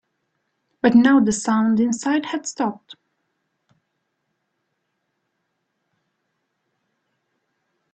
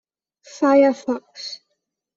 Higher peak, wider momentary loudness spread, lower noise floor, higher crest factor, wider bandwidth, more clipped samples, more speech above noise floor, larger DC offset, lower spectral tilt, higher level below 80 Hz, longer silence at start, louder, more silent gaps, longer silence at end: about the same, -2 dBFS vs -4 dBFS; second, 12 LU vs 18 LU; about the same, -75 dBFS vs -76 dBFS; first, 22 dB vs 16 dB; first, 9 kHz vs 7.8 kHz; neither; about the same, 57 dB vs 58 dB; neither; about the same, -4.5 dB/octave vs -4 dB/octave; first, -62 dBFS vs -68 dBFS; first, 0.85 s vs 0.55 s; about the same, -19 LUFS vs -18 LUFS; neither; first, 5 s vs 0.6 s